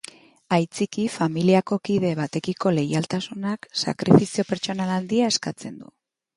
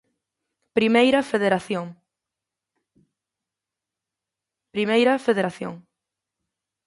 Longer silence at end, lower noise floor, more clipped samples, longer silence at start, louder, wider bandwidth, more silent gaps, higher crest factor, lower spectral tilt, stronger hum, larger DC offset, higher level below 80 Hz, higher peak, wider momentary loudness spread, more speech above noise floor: second, 0.55 s vs 1.1 s; second, -45 dBFS vs -87 dBFS; neither; second, 0.5 s vs 0.75 s; about the same, -23 LUFS vs -21 LUFS; about the same, 11.5 kHz vs 11.5 kHz; neither; about the same, 22 dB vs 20 dB; about the same, -5.5 dB/octave vs -5.5 dB/octave; neither; neither; first, -62 dBFS vs -68 dBFS; first, 0 dBFS vs -6 dBFS; second, 11 LU vs 16 LU; second, 23 dB vs 66 dB